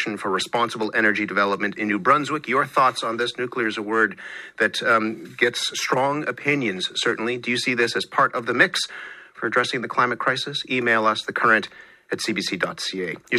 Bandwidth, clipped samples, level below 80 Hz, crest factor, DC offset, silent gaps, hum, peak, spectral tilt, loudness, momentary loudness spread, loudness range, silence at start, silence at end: 15.5 kHz; under 0.1%; -70 dBFS; 22 dB; under 0.1%; none; none; -2 dBFS; -3.5 dB/octave; -22 LUFS; 7 LU; 1 LU; 0 s; 0 s